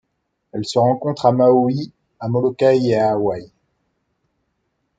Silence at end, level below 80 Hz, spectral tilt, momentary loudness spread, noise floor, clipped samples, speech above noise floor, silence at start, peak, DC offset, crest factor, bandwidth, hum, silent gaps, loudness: 1.55 s; -60 dBFS; -7.5 dB/octave; 16 LU; -72 dBFS; under 0.1%; 56 dB; 0.55 s; -2 dBFS; under 0.1%; 18 dB; 9.2 kHz; none; none; -17 LUFS